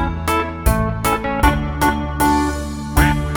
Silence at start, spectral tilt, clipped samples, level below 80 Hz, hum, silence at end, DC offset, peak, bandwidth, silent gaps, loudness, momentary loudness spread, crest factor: 0 s; -5.5 dB/octave; under 0.1%; -24 dBFS; none; 0 s; under 0.1%; 0 dBFS; over 20 kHz; none; -18 LUFS; 3 LU; 18 dB